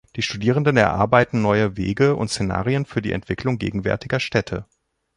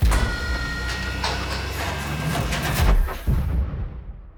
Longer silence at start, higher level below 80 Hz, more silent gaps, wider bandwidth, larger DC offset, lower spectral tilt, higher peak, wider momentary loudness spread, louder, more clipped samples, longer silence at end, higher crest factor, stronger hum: first, 0.15 s vs 0 s; second, -44 dBFS vs -24 dBFS; neither; second, 11.5 kHz vs over 20 kHz; neither; first, -6 dB/octave vs -4.5 dB/octave; first, -2 dBFS vs -6 dBFS; about the same, 8 LU vs 6 LU; first, -21 LUFS vs -25 LUFS; neither; first, 0.55 s vs 0.05 s; about the same, 20 dB vs 16 dB; neither